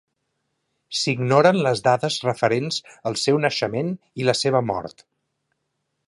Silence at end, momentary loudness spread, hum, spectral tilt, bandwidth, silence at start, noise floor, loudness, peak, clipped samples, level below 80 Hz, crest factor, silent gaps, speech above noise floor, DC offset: 1.15 s; 11 LU; none; -4.5 dB/octave; 11.5 kHz; 0.9 s; -76 dBFS; -21 LUFS; -2 dBFS; under 0.1%; -62 dBFS; 20 dB; none; 55 dB; under 0.1%